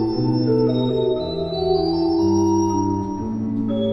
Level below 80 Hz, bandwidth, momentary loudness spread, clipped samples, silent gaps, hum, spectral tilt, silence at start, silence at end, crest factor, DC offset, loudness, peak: -44 dBFS; 6 kHz; 6 LU; under 0.1%; none; none; -8 dB/octave; 0 s; 0 s; 12 dB; under 0.1%; -20 LUFS; -8 dBFS